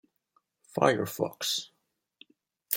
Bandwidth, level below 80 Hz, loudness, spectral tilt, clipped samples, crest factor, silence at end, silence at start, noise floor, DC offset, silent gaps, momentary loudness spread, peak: 17 kHz; -76 dBFS; -29 LUFS; -3.5 dB/octave; under 0.1%; 26 dB; 0 s; 0.75 s; -73 dBFS; under 0.1%; none; 12 LU; -6 dBFS